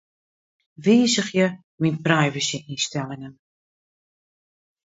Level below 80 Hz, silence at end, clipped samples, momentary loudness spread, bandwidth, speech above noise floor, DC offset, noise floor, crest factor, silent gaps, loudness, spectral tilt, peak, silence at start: -66 dBFS; 1.55 s; under 0.1%; 14 LU; 8 kHz; over 68 dB; under 0.1%; under -90 dBFS; 22 dB; 1.64-1.78 s; -22 LUFS; -4.5 dB/octave; -2 dBFS; 0.8 s